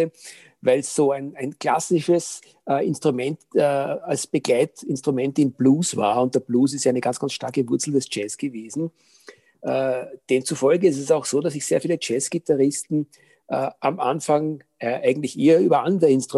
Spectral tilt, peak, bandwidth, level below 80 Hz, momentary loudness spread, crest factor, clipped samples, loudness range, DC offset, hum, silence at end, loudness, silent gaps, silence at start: -5 dB/octave; -6 dBFS; 12.5 kHz; -72 dBFS; 11 LU; 16 dB; under 0.1%; 3 LU; under 0.1%; none; 0 s; -22 LUFS; none; 0 s